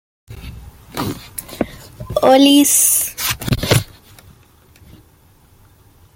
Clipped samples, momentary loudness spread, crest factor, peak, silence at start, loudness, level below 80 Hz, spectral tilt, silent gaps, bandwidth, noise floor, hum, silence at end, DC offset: under 0.1%; 26 LU; 18 dB; 0 dBFS; 0.3 s; -14 LUFS; -40 dBFS; -3.5 dB/octave; none; 17 kHz; -50 dBFS; none; 2.3 s; under 0.1%